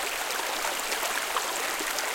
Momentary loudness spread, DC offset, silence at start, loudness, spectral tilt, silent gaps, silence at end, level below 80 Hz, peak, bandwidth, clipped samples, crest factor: 1 LU; under 0.1%; 0 s; -28 LUFS; 1 dB/octave; none; 0 s; -60 dBFS; -10 dBFS; 17 kHz; under 0.1%; 20 dB